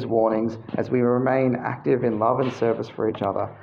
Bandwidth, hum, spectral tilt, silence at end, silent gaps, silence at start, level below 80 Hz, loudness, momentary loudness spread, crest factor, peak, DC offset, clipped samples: 7 kHz; none; -8.5 dB/octave; 0 s; none; 0 s; -62 dBFS; -23 LUFS; 6 LU; 16 dB; -6 dBFS; under 0.1%; under 0.1%